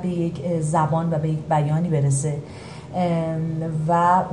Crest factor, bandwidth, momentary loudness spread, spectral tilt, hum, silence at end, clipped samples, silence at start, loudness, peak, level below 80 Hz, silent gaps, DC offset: 16 dB; 11.5 kHz; 9 LU; -7 dB/octave; none; 0 s; under 0.1%; 0 s; -22 LUFS; -6 dBFS; -50 dBFS; none; 0.1%